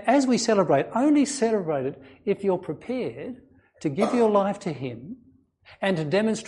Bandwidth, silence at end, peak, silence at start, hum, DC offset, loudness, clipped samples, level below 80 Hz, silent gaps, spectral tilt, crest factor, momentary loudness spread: 11.5 kHz; 0 s; -6 dBFS; 0 s; none; under 0.1%; -24 LUFS; under 0.1%; -66 dBFS; none; -5.5 dB/octave; 18 dB; 15 LU